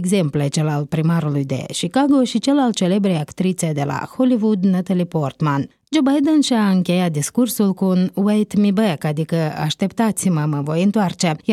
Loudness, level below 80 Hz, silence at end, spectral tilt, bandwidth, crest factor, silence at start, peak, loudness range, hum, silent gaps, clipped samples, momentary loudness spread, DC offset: -18 LUFS; -58 dBFS; 0 s; -6 dB/octave; 15 kHz; 14 dB; 0 s; -4 dBFS; 2 LU; none; none; under 0.1%; 5 LU; under 0.1%